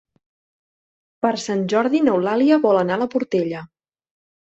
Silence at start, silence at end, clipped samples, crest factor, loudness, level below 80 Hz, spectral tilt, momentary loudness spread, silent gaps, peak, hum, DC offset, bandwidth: 1.25 s; 0.85 s; under 0.1%; 18 dB; -19 LUFS; -64 dBFS; -6 dB/octave; 7 LU; none; -4 dBFS; none; under 0.1%; 8.2 kHz